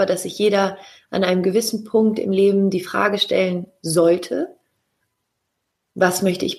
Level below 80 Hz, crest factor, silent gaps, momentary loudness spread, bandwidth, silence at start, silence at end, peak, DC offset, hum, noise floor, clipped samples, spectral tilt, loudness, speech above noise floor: -64 dBFS; 18 dB; none; 10 LU; 15 kHz; 0 s; 0 s; -2 dBFS; under 0.1%; none; -76 dBFS; under 0.1%; -4.5 dB/octave; -19 LUFS; 57 dB